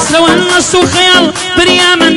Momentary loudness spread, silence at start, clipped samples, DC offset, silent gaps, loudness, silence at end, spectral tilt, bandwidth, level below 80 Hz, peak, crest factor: 3 LU; 0 s; 0.9%; 0.4%; none; -6 LUFS; 0 s; -2.5 dB/octave; 12 kHz; -36 dBFS; 0 dBFS; 8 dB